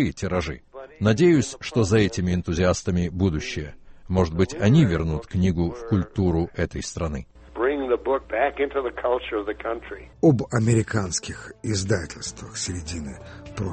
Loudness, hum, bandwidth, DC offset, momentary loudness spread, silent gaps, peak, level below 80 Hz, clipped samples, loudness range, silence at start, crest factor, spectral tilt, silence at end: -24 LUFS; none; 8.8 kHz; under 0.1%; 14 LU; none; -6 dBFS; -40 dBFS; under 0.1%; 3 LU; 0 s; 18 dB; -6 dB/octave; 0 s